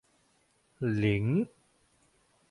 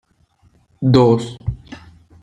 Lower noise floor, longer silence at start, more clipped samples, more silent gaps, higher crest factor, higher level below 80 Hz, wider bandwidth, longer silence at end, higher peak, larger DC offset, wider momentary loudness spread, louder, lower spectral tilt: first, -70 dBFS vs -57 dBFS; about the same, 0.8 s vs 0.8 s; neither; neither; about the same, 18 dB vs 18 dB; second, -58 dBFS vs -40 dBFS; first, 11 kHz vs 9.8 kHz; first, 1.05 s vs 0.45 s; second, -16 dBFS vs -2 dBFS; neither; second, 8 LU vs 21 LU; second, -30 LUFS vs -16 LUFS; about the same, -8.5 dB/octave vs -8 dB/octave